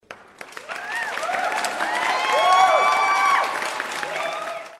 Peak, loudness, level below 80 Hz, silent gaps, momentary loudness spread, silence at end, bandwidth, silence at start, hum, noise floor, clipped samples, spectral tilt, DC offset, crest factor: -4 dBFS; -20 LUFS; -70 dBFS; none; 16 LU; 0.05 s; 15.5 kHz; 0.1 s; none; -42 dBFS; under 0.1%; -0.5 dB/octave; under 0.1%; 18 dB